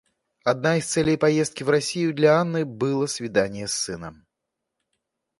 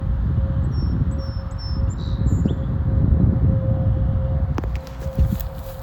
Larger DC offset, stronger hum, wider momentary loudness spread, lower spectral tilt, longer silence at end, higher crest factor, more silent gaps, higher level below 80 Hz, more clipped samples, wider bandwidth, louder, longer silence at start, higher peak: neither; neither; about the same, 8 LU vs 10 LU; second, -4.5 dB/octave vs -9 dB/octave; first, 1.25 s vs 0 s; about the same, 18 dB vs 16 dB; neither; second, -58 dBFS vs -24 dBFS; neither; second, 11.5 kHz vs 19 kHz; about the same, -23 LUFS vs -22 LUFS; first, 0.45 s vs 0 s; about the same, -6 dBFS vs -4 dBFS